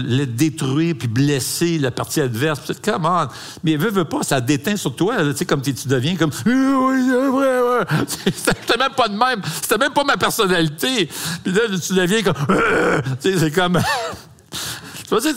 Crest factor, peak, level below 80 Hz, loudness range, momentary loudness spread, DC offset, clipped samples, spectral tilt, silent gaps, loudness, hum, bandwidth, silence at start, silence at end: 16 dB; -2 dBFS; -48 dBFS; 2 LU; 6 LU; 0.2%; under 0.1%; -4.5 dB/octave; none; -18 LUFS; none; 16 kHz; 0 s; 0 s